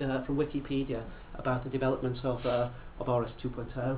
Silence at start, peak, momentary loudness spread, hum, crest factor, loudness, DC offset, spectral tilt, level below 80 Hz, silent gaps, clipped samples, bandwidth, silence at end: 0 s; -16 dBFS; 7 LU; none; 16 dB; -33 LUFS; under 0.1%; -6.5 dB/octave; -48 dBFS; none; under 0.1%; 4 kHz; 0 s